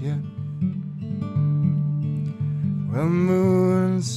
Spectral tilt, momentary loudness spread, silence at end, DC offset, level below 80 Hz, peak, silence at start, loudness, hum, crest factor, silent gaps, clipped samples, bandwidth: -8 dB/octave; 10 LU; 0 s; under 0.1%; -60 dBFS; -8 dBFS; 0 s; -23 LUFS; none; 14 dB; none; under 0.1%; 11 kHz